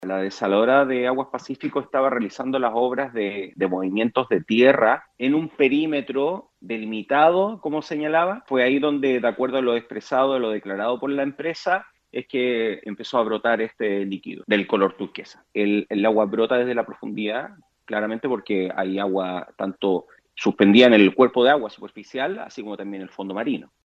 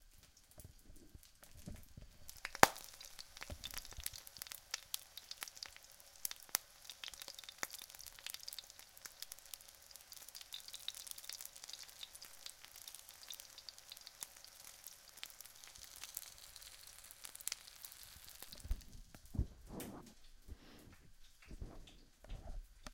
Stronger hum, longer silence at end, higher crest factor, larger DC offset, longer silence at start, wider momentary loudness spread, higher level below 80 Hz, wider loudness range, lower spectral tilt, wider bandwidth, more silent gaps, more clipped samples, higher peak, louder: neither; first, 0.2 s vs 0 s; second, 22 dB vs 48 dB; neither; about the same, 0 s vs 0 s; about the same, 14 LU vs 15 LU; second, -72 dBFS vs -56 dBFS; second, 6 LU vs 12 LU; first, -6.5 dB/octave vs -2 dB/octave; second, 7.8 kHz vs 17 kHz; neither; neither; about the same, 0 dBFS vs 0 dBFS; first, -22 LUFS vs -46 LUFS